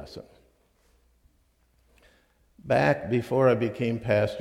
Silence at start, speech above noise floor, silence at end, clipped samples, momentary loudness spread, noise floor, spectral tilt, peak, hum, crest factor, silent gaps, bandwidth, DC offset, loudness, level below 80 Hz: 0 s; 41 dB; 0 s; under 0.1%; 10 LU; -66 dBFS; -7.5 dB/octave; -10 dBFS; none; 18 dB; none; 14.5 kHz; under 0.1%; -25 LUFS; -58 dBFS